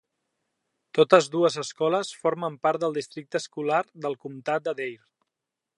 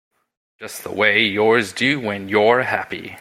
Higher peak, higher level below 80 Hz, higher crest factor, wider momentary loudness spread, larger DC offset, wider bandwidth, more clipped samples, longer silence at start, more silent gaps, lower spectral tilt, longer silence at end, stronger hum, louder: about the same, -2 dBFS vs 0 dBFS; second, -80 dBFS vs -62 dBFS; first, 24 dB vs 18 dB; about the same, 14 LU vs 16 LU; neither; second, 11.5 kHz vs 15.5 kHz; neither; first, 0.95 s vs 0.6 s; neither; about the same, -4.5 dB/octave vs -4 dB/octave; first, 0.85 s vs 0 s; neither; second, -26 LUFS vs -17 LUFS